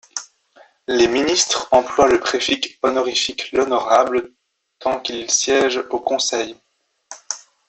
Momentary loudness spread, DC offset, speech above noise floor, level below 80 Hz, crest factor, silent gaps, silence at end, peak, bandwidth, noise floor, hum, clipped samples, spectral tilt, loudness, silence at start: 14 LU; under 0.1%; 34 dB; -54 dBFS; 18 dB; none; 0.3 s; -2 dBFS; 8.4 kHz; -52 dBFS; none; under 0.1%; -1.5 dB/octave; -18 LUFS; 0.15 s